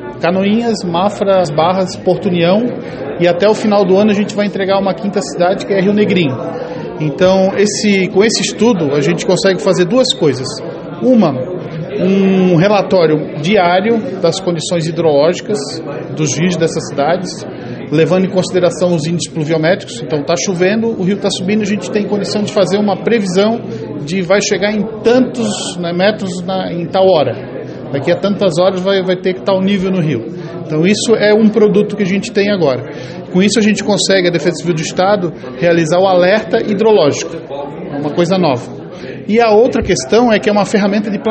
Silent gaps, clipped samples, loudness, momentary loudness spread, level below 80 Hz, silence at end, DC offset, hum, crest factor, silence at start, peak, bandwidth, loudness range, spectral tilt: none; under 0.1%; -13 LUFS; 10 LU; -46 dBFS; 0 s; under 0.1%; none; 12 dB; 0 s; 0 dBFS; 8.8 kHz; 3 LU; -5.5 dB/octave